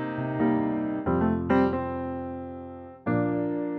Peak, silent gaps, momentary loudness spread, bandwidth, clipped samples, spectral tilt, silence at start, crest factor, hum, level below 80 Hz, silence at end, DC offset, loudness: -12 dBFS; none; 13 LU; 5.6 kHz; under 0.1%; -10.5 dB/octave; 0 s; 16 dB; none; -52 dBFS; 0 s; under 0.1%; -27 LUFS